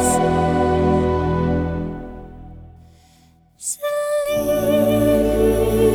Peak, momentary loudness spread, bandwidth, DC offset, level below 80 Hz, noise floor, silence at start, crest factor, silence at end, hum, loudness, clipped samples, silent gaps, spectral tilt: -4 dBFS; 13 LU; 19.5 kHz; under 0.1%; -32 dBFS; -53 dBFS; 0 s; 14 dB; 0 s; none; -19 LUFS; under 0.1%; none; -6 dB/octave